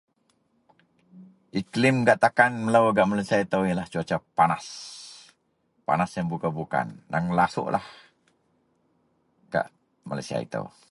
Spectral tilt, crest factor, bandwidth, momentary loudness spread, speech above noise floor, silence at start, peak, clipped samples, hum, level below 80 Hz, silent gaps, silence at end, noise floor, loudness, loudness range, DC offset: -6 dB/octave; 22 dB; 11.5 kHz; 16 LU; 46 dB; 1.15 s; -4 dBFS; under 0.1%; none; -60 dBFS; none; 0.25 s; -70 dBFS; -25 LUFS; 8 LU; under 0.1%